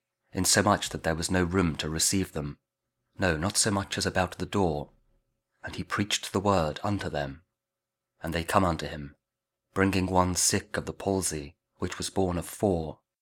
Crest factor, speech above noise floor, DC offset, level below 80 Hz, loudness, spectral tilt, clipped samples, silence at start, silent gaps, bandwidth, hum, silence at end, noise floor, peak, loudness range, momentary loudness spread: 24 dB; 60 dB; under 0.1%; -50 dBFS; -28 LUFS; -4 dB/octave; under 0.1%; 0.35 s; none; 19 kHz; none; 0.25 s; -88 dBFS; -6 dBFS; 4 LU; 14 LU